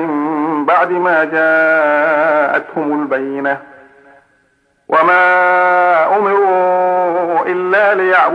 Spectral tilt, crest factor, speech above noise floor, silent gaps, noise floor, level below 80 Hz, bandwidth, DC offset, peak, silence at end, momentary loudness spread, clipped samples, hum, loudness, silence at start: -6.5 dB/octave; 12 dB; 46 dB; none; -58 dBFS; -68 dBFS; 9.6 kHz; under 0.1%; 0 dBFS; 0 s; 7 LU; under 0.1%; none; -12 LUFS; 0 s